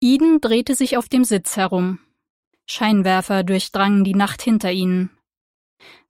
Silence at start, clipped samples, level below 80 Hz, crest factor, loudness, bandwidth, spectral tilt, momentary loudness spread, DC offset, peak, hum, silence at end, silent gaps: 0 s; under 0.1%; -56 dBFS; 16 dB; -18 LUFS; 16.5 kHz; -5 dB/octave; 7 LU; under 0.1%; -2 dBFS; none; 1 s; 2.30-2.51 s